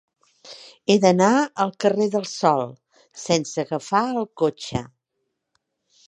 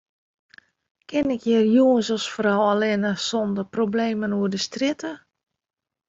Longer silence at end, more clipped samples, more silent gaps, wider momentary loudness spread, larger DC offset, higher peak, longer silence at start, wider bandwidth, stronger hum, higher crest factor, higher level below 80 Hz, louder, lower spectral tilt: first, 1.2 s vs 0.9 s; neither; neither; first, 14 LU vs 8 LU; neither; first, -2 dBFS vs -8 dBFS; second, 0.45 s vs 1.1 s; first, 10.5 kHz vs 7.8 kHz; neither; about the same, 20 dB vs 16 dB; about the same, -58 dBFS vs -62 dBFS; about the same, -21 LUFS vs -22 LUFS; about the same, -5 dB/octave vs -5 dB/octave